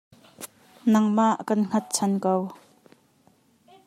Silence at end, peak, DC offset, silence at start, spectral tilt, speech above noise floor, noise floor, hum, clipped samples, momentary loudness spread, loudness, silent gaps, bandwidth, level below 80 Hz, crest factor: 1.3 s; -8 dBFS; under 0.1%; 0.4 s; -5.5 dB/octave; 39 dB; -62 dBFS; none; under 0.1%; 21 LU; -24 LUFS; none; 15 kHz; -76 dBFS; 18 dB